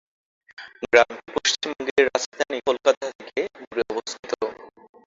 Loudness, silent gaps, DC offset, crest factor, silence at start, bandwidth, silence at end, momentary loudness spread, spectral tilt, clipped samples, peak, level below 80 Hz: -23 LUFS; 1.91-1.96 s, 2.26-2.32 s, 2.97-3.01 s, 3.15-3.19 s, 3.67-3.71 s, 4.19-4.23 s; under 0.1%; 24 dB; 0.6 s; 7.8 kHz; 0.35 s; 12 LU; -1.5 dB/octave; under 0.1%; -2 dBFS; -62 dBFS